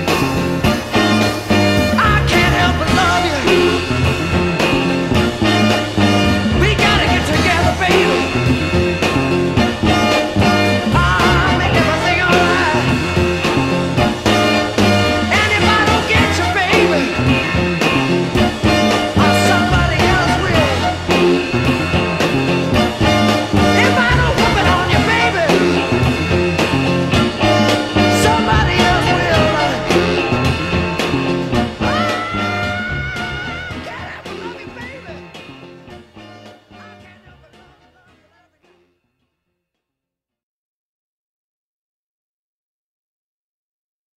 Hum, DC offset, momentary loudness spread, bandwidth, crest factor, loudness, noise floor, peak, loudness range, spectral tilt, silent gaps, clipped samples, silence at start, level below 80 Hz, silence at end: none; under 0.1%; 6 LU; 15.5 kHz; 16 dB; -14 LUFS; -84 dBFS; 0 dBFS; 6 LU; -5 dB/octave; none; under 0.1%; 0 s; -30 dBFS; 7.25 s